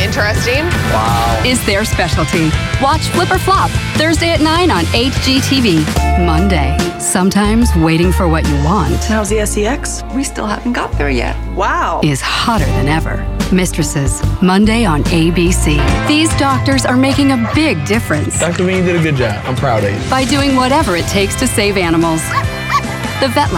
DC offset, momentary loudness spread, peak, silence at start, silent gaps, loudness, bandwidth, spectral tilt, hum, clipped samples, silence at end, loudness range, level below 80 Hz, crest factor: under 0.1%; 5 LU; -2 dBFS; 0 s; none; -13 LUFS; 17 kHz; -5 dB/octave; none; under 0.1%; 0 s; 3 LU; -22 dBFS; 10 dB